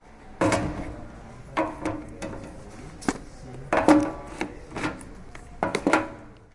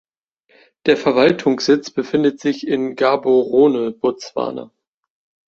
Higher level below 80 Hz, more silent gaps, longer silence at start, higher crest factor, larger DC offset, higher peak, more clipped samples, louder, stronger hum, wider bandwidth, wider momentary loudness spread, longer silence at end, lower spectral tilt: first, -46 dBFS vs -60 dBFS; neither; second, 0.05 s vs 0.85 s; first, 26 dB vs 16 dB; neither; about the same, -2 dBFS vs -2 dBFS; neither; second, -27 LUFS vs -17 LUFS; neither; first, 11.5 kHz vs 7.6 kHz; first, 22 LU vs 10 LU; second, 0.1 s vs 0.8 s; about the same, -5.5 dB/octave vs -5.5 dB/octave